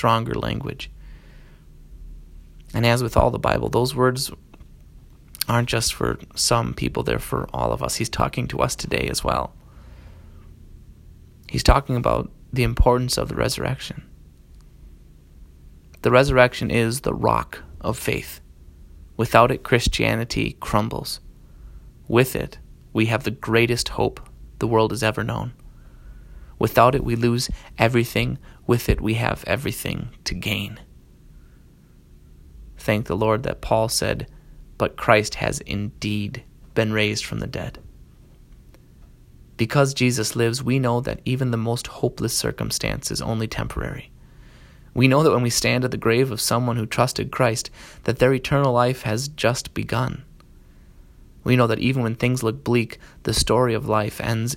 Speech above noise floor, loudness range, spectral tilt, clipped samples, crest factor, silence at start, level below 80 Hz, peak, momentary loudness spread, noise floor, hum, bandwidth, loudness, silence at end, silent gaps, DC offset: 29 dB; 5 LU; -5 dB/octave; under 0.1%; 22 dB; 0 s; -36 dBFS; 0 dBFS; 11 LU; -50 dBFS; none; 16.5 kHz; -22 LUFS; 0 s; none; under 0.1%